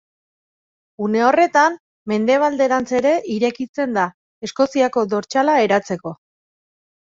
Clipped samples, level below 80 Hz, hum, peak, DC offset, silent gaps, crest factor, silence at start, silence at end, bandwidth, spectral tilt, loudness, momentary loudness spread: under 0.1%; -64 dBFS; none; -2 dBFS; under 0.1%; 1.80-2.06 s, 3.69-3.74 s, 4.14-4.41 s; 18 dB; 1 s; 0.95 s; 7.8 kHz; -5 dB/octave; -18 LUFS; 12 LU